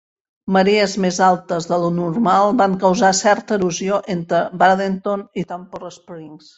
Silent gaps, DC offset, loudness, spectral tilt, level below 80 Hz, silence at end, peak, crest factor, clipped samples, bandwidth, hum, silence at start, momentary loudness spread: none; under 0.1%; -17 LUFS; -5 dB/octave; -58 dBFS; 0.2 s; -2 dBFS; 16 dB; under 0.1%; 8.2 kHz; none; 0.45 s; 19 LU